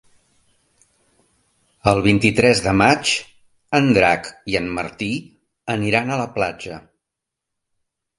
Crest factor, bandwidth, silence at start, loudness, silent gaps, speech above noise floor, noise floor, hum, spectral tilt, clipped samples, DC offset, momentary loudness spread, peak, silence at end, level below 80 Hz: 20 dB; 11.5 kHz; 1.85 s; -18 LUFS; none; 65 dB; -83 dBFS; none; -5 dB/octave; under 0.1%; under 0.1%; 12 LU; 0 dBFS; 1.4 s; -46 dBFS